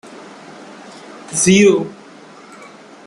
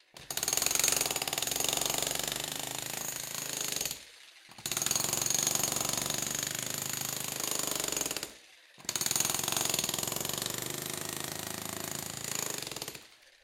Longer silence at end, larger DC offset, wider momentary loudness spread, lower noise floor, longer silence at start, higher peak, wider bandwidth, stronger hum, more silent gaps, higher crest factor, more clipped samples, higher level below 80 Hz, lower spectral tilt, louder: first, 1.15 s vs 0.15 s; neither; first, 26 LU vs 10 LU; second, -40 dBFS vs -56 dBFS; about the same, 0.1 s vs 0.15 s; first, 0 dBFS vs -10 dBFS; second, 12 kHz vs 17 kHz; neither; neither; second, 18 dB vs 24 dB; neither; first, -58 dBFS vs -64 dBFS; first, -4 dB/octave vs -1 dB/octave; first, -13 LUFS vs -31 LUFS